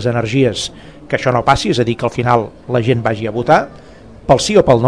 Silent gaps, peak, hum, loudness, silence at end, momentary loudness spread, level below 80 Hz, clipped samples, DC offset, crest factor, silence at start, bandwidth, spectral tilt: none; 0 dBFS; none; -15 LUFS; 0 s; 10 LU; -38 dBFS; 0.4%; 0.5%; 14 dB; 0 s; 11 kHz; -5.5 dB/octave